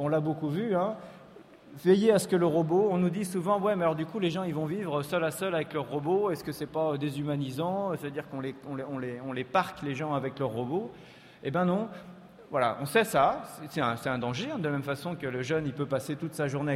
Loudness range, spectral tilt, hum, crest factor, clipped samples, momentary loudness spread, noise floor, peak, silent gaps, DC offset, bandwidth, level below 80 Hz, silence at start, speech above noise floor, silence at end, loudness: 6 LU; -6 dB/octave; none; 18 dB; under 0.1%; 11 LU; -52 dBFS; -12 dBFS; none; under 0.1%; 16 kHz; -66 dBFS; 0 s; 23 dB; 0 s; -30 LUFS